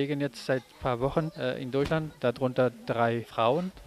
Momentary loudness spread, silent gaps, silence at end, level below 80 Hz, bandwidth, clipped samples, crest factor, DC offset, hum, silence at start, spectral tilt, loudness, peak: 5 LU; none; 0 s; -52 dBFS; 14.5 kHz; under 0.1%; 18 dB; under 0.1%; none; 0 s; -7 dB/octave; -29 LUFS; -10 dBFS